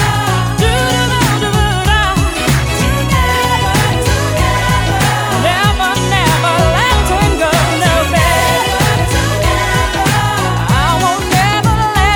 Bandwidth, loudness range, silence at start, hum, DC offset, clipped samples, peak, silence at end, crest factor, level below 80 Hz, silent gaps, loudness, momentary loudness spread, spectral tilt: 20 kHz; 1 LU; 0 s; none; under 0.1%; under 0.1%; 0 dBFS; 0 s; 12 dB; -20 dBFS; none; -12 LUFS; 2 LU; -4.5 dB/octave